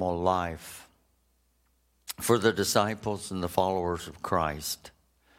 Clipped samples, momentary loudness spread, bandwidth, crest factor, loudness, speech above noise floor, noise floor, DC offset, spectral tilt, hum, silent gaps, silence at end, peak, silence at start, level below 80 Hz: under 0.1%; 17 LU; 16.5 kHz; 24 dB; -29 LUFS; 41 dB; -70 dBFS; under 0.1%; -4 dB/octave; none; none; 0.5 s; -6 dBFS; 0 s; -54 dBFS